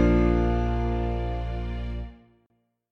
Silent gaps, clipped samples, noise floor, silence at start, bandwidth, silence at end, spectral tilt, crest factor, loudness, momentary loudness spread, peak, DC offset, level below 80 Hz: none; under 0.1%; -71 dBFS; 0 s; 6.2 kHz; 0.75 s; -9 dB/octave; 16 dB; -27 LUFS; 14 LU; -10 dBFS; under 0.1%; -30 dBFS